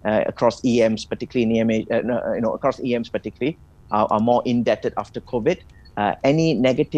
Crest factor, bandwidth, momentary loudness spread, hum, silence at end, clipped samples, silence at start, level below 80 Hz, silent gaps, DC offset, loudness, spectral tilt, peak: 18 dB; 8.8 kHz; 8 LU; none; 0 s; under 0.1%; 0.05 s; -50 dBFS; none; under 0.1%; -21 LUFS; -6.5 dB/octave; -2 dBFS